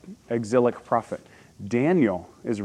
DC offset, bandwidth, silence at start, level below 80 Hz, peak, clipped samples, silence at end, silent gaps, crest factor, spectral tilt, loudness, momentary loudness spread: under 0.1%; 11 kHz; 0.05 s; -66 dBFS; -8 dBFS; under 0.1%; 0 s; none; 18 dB; -7.5 dB/octave; -24 LUFS; 16 LU